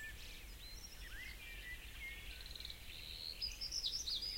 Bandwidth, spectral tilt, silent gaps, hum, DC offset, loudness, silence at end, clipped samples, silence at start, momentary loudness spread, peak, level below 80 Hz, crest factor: 16.5 kHz; -0.5 dB/octave; none; none; under 0.1%; -46 LUFS; 0 s; under 0.1%; 0 s; 13 LU; -30 dBFS; -56 dBFS; 18 dB